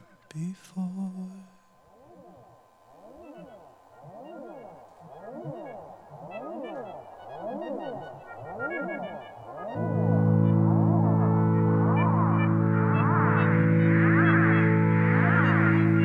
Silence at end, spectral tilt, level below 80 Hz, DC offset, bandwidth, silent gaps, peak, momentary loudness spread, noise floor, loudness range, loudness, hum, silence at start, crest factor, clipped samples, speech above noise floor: 0 s; -10 dB/octave; -68 dBFS; under 0.1%; 3.9 kHz; none; -10 dBFS; 22 LU; -57 dBFS; 22 LU; -24 LUFS; none; 0.35 s; 16 dB; under 0.1%; 22 dB